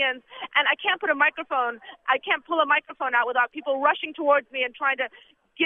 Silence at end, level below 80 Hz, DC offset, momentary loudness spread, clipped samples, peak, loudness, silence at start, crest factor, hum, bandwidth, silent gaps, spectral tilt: 0 s; -76 dBFS; under 0.1%; 7 LU; under 0.1%; -8 dBFS; -24 LUFS; 0 s; 18 dB; none; 3.8 kHz; none; -4.5 dB/octave